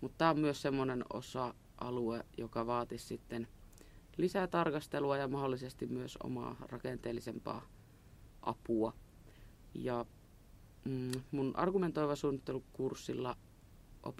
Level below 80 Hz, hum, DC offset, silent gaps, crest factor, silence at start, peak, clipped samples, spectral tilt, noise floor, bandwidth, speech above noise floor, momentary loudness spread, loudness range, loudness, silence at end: -60 dBFS; none; under 0.1%; none; 24 dB; 0 s; -16 dBFS; under 0.1%; -6.5 dB/octave; -60 dBFS; 16 kHz; 22 dB; 11 LU; 5 LU; -39 LUFS; 0 s